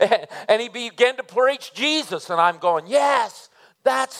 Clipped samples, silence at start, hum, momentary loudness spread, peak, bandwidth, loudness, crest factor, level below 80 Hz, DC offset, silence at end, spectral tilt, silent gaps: under 0.1%; 0 s; none; 5 LU; -2 dBFS; 15 kHz; -21 LUFS; 20 dB; -86 dBFS; under 0.1%; 0 s; -2.5 dB/octave; none